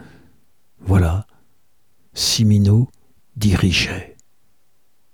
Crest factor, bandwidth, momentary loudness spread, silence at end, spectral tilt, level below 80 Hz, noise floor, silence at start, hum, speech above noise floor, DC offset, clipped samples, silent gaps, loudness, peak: 16 dB; 18 kHz; 17 LU; 1.05 s; -5 dB/octave; -36 dBFS; -67 dBFS; 0.85 s; none; 51 dB; 0.3%; under 0.1%; none; -17 LUFS; -4 dBFS